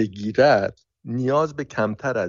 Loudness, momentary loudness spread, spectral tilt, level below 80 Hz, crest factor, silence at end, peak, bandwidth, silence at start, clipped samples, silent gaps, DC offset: -22 LUFS; 10 LU; -5 dB/octave; -58 dBFS; 18 dB; 0 s; -4 dBFS; 7.4 kHz; 0 s; under 0.1%; none; under 0.1%